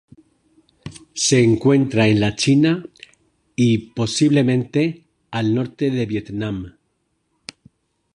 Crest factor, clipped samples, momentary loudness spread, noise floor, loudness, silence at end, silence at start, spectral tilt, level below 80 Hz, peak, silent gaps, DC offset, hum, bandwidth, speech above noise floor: 16 dB; under 0.1%; 23 LU; -69 dBFS; -18 LUFS; 1.45 s; 0.85 s; -5.5 dB/octave; -50 dBFS; -4 dBFS; none; under 0.1%; none; 11 kHz; 52 dB